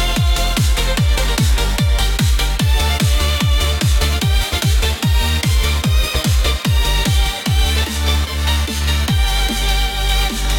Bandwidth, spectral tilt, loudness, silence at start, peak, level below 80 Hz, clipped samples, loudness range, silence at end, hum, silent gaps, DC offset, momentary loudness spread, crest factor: 17.5 kHz; -4 dB/octave; -16 LUFS; 0 s; -2 dBFS; -18 dBFS; under 0.1%; 1 LU; 0 s; none; none; under 0.1%; 2 LU; 14 dB